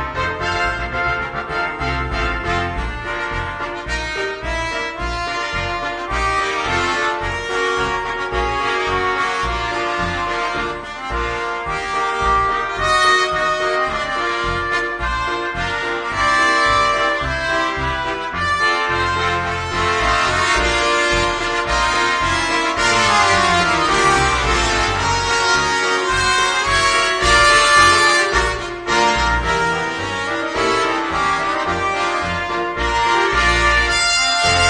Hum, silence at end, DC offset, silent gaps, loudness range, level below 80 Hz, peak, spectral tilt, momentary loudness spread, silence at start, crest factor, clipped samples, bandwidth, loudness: none; 0 s; under 0.1%; none; 8 LU; -32 dBFS; 0 dBFS; -3 dB/octave; 9 LU; 0 s; 18 dB; under 0.1%; 10 kHz; -17 LUFS